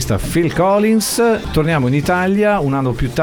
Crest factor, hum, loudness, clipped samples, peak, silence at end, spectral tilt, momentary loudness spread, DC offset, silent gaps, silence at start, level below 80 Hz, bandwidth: 12 dB; none; -15 LUFS; under 0.1%; -2 dBFS; 0 s; -5.5 dB/octave; 4 LU; under 0.1%; none; 0 s; -30 dBFS; 20 kHz